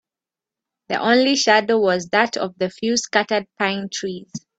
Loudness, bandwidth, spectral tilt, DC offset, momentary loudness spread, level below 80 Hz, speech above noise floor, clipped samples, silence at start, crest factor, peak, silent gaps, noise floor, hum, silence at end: -19 LUFS; 9 kHz; -3 dB/octave; under 0.1%; 11 LU; -64 dBFS; 69 dB; under 0.1%; 0.9 s; 20 dB; 0 dBFS; none; -89 dBFS; none; 0.2 s